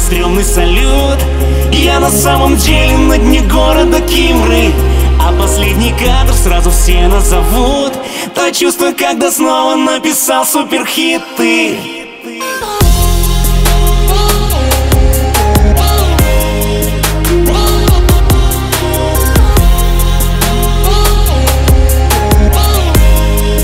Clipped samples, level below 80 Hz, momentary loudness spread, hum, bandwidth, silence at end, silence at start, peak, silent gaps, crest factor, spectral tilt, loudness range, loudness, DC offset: 0.3%; -10 dBFS; 4 LU; none; 16.5 kHz; 0 s; 0 s; 0 dBFS; none; 8 dB; -4.5 dB/octave; 3 LU; -10 LUFS; under 0.1%